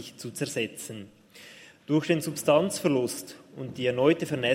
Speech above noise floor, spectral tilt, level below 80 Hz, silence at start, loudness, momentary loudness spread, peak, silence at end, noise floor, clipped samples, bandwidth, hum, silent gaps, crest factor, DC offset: 23 dB; -5 dB/octave; -70 dBFS; 0 s; -27 LUFS; 20 LU; -8 dBFS; 0 s; -50 dBFS; under 0.1%; 16 kHz; none; none; 20 dB; under 0.1%